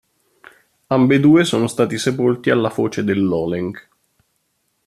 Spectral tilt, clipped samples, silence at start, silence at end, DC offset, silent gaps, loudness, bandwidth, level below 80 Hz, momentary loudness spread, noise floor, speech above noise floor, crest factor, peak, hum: -6 dB/octave; under 0.1%; 0.9 s; 1.05 s; under 0.1%; none; -17 LUFS; 13.5 kHz; -56 dBFS; 10 LU; -68 dBFS; 52 dB; 16 dB; -2 dBFS; none